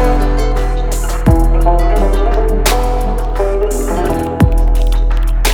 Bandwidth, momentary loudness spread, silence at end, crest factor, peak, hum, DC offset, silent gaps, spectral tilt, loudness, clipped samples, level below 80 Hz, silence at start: 17 kHz; 5 LU; 0 s; 10 dB; 0 dBFS; none; under 0.1%; none; -5.5 dB/octave; -15 LUFS; under 0.1%; -12 dBFS; 0 s